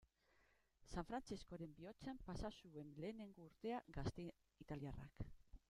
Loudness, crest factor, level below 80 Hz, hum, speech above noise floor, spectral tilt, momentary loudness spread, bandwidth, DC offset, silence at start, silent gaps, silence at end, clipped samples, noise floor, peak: -53 LUFS; 20 dB; -64 dBFS; none; 27 dB; -6.5 dB/octave; 8 LU; 13.5 kHz; under 0.1%; 0 s; none; 0.1 s; under 0.1%; -79 dBFS; -34 dBFS